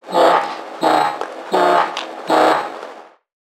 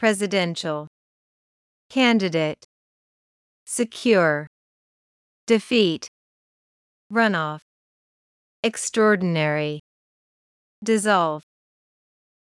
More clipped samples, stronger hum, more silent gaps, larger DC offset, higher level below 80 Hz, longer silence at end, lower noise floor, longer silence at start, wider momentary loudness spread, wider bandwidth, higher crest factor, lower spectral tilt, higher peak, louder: neither; neither; second, none vs 0.87-1.90 s, 2.64-3.66 s, 4.47-5.47 s, 6.08-7.10 s, 7.62-8.63 s, 9.79-10.82 s; neither; about the same, -74 dBFS vs -74 dBFS; second, 0.55 s vs 1.05 s; second, -38 dBFS vs under -90 dBFS; about the same, 0.05 s vs 0 s; about the same, 14 LU vs 14 LU; first, 17 kHz vs 12 kHz; about the same, 16 dB vs 18 dB; about the same, -3.5 dB/octave vs -4.5 dB/octave; first, 0 dBFS vs -6 dBFS; first, -17 LUFS vs -22 LUFS